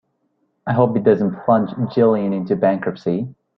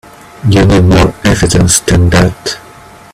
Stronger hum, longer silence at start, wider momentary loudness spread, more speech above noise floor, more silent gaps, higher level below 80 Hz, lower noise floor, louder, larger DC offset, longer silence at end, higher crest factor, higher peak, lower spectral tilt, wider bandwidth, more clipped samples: neither; first, 0.65 s vs 0.4 s; second, 7 LU vs 12 LU; first, 50 dB vs 27 dB; neither; second, -58 dBFS vs -22 dBFS; first, -67 dBFS vs -35 dBFS; second, -18 LUFS vs -9 LUFS; neither; second, 0.25 s vs 0.55 s; first, 16 dB vs 10 dB; about the same, -2 dBFS vs 0 dBFS; first, -10.5 dB/octave vs -5 dB/octave; second, 6 kHz vs 14.5 kHz; neither